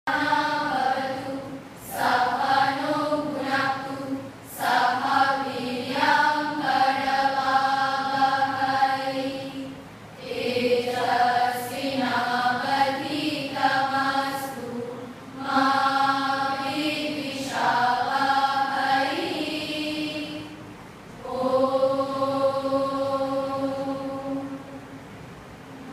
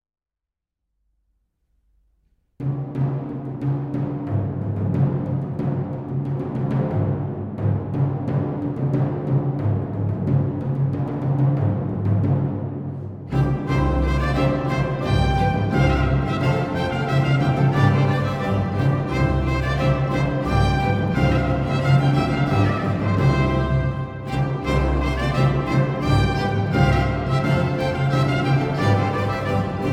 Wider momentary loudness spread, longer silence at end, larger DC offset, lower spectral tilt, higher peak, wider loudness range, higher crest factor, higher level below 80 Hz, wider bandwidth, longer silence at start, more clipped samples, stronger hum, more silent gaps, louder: first, 16 LU vs 7 LU; about the same, 0 s vs 0 s; neither; second, -4 dB/octave vs -8 dB/octave; second, -8 dBFS vs -4 dBFS; about the same, 4 LU vs 5 LU; about the same, 18 dB vs 16 dB; second, -62 dBFS vs -32 dBFS; first, 15.5 kHz vs 8.8 kHz; second, 0.05 s vs 2.6 s; neither; neither; neither; second, -24 LUFS vs -21 LUFS